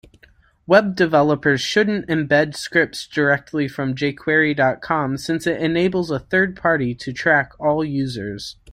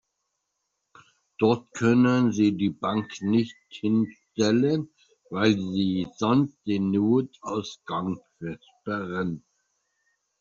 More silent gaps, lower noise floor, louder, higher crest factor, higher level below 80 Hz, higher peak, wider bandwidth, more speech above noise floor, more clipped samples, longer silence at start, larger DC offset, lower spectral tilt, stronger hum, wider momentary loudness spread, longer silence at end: neither; second, -54 dBFS vs -79 dBFS; first, -19 LUFS vs -25 LUFS; about the same, 18 dB vs 18 dB; first, -52 dBFS vs -66 dBFS; first, -2 dBFS vs -8 dBFS; first, 15 kHz vs 7.6 kHz; second, 35 dB vs 55 dB; neither; second, 0.7 s vs 1.4 s; neither; about the same, -5.5 dB/octave vs -6 dB/octave; neither; second, 7 LU vs 12 LU; second, 0 s vs 1 s